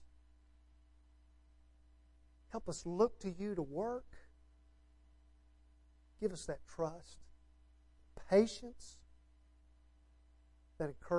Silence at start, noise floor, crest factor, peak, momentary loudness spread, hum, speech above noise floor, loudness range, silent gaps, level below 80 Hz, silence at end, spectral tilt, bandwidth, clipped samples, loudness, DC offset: 0 s; -66 dBFS; 24 dB; -18 dBFS; 27 LU; none; 28 dB; 7 LU; none; -62 dBFS; 0 s; -6 dB/octave; 11.5 kHz; under 0.1%; -39 LUFS; under 0.1%